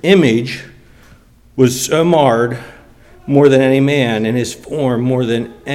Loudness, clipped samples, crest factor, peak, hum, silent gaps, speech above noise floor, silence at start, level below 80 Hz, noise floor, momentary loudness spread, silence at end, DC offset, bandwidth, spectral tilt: -14 LUFS; under 0.1%; 14 dB; 0 dBFS; none; none; 32 dB; 0.05 s; -48 dBFS; -45 dBFS; 13 LU; 0 s; under 0.1%; 16.5 kHz; -5.5 dB/octave